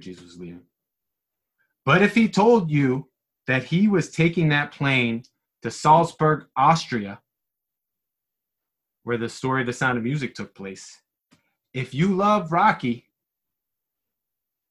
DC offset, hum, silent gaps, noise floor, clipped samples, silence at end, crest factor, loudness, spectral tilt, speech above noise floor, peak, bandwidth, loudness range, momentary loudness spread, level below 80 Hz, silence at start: under 0.1%; none; none; -84 dBFS; under 0.1%; 1.7 s; 20 dB; -21 LUFS; -6 dB/octave; 63 dB; -4 dBFS; 11.5 kHz; 8 LU; 19 LU; -60 dBFS; 0.05 s